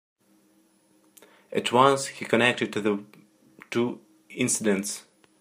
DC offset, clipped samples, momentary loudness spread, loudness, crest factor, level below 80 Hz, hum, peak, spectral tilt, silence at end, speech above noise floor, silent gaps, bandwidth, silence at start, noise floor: under 0.1%; under 0.1%; 13 LU; -25 LUFS; 24 dB; -72 dBFS; none; -4 dBFS; -3.5 dB/octave; 0.4 s; 39 dB; none; 15.5 kHz; 1.5 s; -63 dBFS